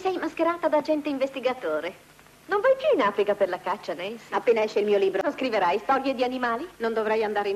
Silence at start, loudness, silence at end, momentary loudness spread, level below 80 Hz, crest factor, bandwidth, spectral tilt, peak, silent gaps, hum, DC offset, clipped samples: 0 s; -25 LUFS; 0 s; 7 LU; -66 dBFS; 14 dB; 14 kHz; -5 dB/octave; -12 dBFS; none; 50 Hz at -65 dBFS; under 0.1%; under 0.1%